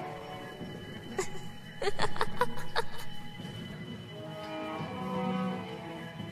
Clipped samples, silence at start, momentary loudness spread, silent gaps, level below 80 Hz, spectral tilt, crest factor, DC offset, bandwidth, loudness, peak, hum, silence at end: under 0.1%; 0 s; 10 LU; none; -52 dBFS; -5 dB/octave; 22 dB; under 0.1%; 14 kHz; -37 LUFS; -10 dBFS; none; 0 s